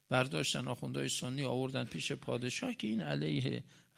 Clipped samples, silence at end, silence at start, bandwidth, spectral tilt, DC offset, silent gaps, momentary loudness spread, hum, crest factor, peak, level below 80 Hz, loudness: under 0.1%; 0.2 s; 0.1 s; 15.5 kHz; -4.5 dB/octave; under 0.1%; none; 5 LU; none; 22 dB; -14 dBFS; -72 dBFS; -37 LUFS